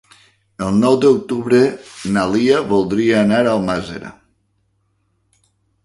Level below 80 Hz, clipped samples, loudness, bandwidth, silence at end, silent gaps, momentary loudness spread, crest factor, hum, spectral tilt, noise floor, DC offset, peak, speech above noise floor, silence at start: -50 dBFS; under 0.1%; -16 LUFS; 11.5 kHz; 1.75 s; none; 13 LU; 16 dB; none; -6 dB/octave; -64 dBFS; under 0.1%; -2 dBFS; 49 dB; 0.6 s